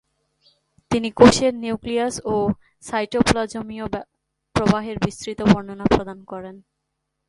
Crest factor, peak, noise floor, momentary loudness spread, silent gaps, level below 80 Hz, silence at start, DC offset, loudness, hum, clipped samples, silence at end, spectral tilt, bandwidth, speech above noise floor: 22 dB; 0 dBFS; -77 dBFS; 18 LU; none; -42 dBFS; 0.9 s; under 0.1%; -20 LUFS; none; under 0.1%; 0.7 s; -5.5 dB/octave; 11.5 kHz; 57 dB